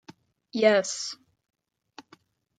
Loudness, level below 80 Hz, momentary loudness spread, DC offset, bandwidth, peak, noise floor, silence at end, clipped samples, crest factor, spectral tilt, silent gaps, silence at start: -25 LUFS; -82 dBFS; 15 LU; under 0.1%; 9.4 kHz; -8 dBFS; -60 dBFS; 1.45 s; under 0.1%; 22 dB; -3 dB/octave; none; 0.1 s